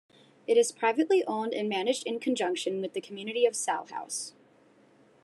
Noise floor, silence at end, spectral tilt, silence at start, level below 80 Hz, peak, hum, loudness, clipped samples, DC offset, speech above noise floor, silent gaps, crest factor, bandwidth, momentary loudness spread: -61 dBFS; 0.95 s; -3 dB/octave; 0.5 s; -90 dBFS; -12 dBFS; none; -29 LUFS; under 0.1%; under 0.1%; 32 dB; none; 18 dB; 12.5 kHz; 10 LU